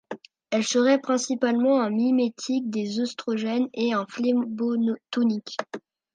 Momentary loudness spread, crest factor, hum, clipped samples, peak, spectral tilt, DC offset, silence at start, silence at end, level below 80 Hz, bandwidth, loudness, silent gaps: 10 LU; 16 dB; none; under 0.1%; -8 dBFS; -4.5 dB/octave; under 0.1%; 0.1 s; 0.35 s; -78 dBFS; 9.4 kHz; -25 LUFS; none